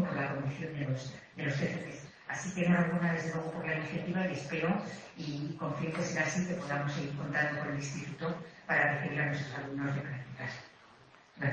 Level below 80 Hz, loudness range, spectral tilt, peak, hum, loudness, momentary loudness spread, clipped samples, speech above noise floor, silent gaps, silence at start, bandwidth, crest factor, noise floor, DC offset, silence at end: -68 dBFS; 2 LU; -6 dB/octave; -16 dBFS; none; -34 LUFS; 12 LU; under 0.1%; 25 dB; none; 0 s; 8.4 kHz; 20 dB; -59 dBFS; under 0.1%; 0 s